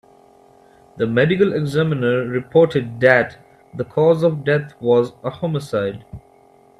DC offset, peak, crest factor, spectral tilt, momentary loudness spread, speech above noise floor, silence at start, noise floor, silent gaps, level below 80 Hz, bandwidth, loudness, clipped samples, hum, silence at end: under 0.1%; 0 dBFS; 18 dB; -7.5 dB/octave; 11 LU; 33 dB; 0.95 s; -51 dBFS; none; -54 dBFS; 12 kHz; -18 LUFS; under 0.1%; none; 0.6 s